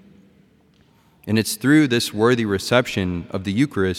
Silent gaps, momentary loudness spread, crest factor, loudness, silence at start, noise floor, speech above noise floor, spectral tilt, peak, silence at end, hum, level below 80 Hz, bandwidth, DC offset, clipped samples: none; 9 LU; 18 dB; -19 LUFS; 1.25 s; -56 dBFS; 37 dB; -5 dB/octave; -2 dBFS; 0 s; none; -56 dBFS; 16.5 kHz; under 0.1%; under 0.1%